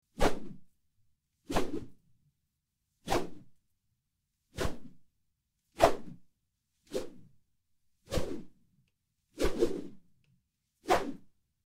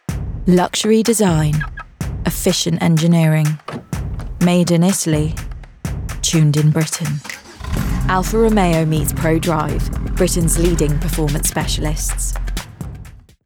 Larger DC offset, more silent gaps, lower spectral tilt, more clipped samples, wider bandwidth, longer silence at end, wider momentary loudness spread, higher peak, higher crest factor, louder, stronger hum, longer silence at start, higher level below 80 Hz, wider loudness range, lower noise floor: neither; neither; about the same, -5 dB/octave vs -5 dB/octave; neither; second, 16 kHz vs 19 kHz; first, 0.4 s vs 0.25 s; first, 23 LU vs 14 LU; second, -8 dBFS vs -4 dBFS; first, 28 dB vs 14 dB; second, -34 LUFS vs -17 LUFS; neither; about the same, 0.2 s vs 0.1 s; second, -46 dBFS vs -26 dBFS; about the same, 5 LU vs 3 LU; first, -83 dBFS vs -37 dBFS